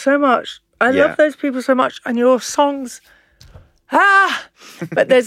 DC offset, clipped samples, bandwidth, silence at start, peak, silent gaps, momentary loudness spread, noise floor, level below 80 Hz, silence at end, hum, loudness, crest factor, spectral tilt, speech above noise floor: under 0.1%; under 0.1%; 15 kHz; 0 s; -2 dBFS; none; 14 LU; -44 dBFS; -58 dBFS; 0 s; none; -15 LUFS; 14 dB; -3.5 dB/octave; 29 dB